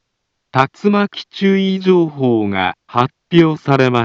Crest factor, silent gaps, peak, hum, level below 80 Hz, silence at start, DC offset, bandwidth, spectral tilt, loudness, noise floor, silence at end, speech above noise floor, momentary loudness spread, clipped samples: 14 dB; none; 0 dBFS; none; -58 dBFS; 0.55 s; under 0.1%; 7.4 kHz; -7.5 dB/octave; -15 LUFS; -72 dBFS; 0 s; 58 dB; 5 LU; under 0.1%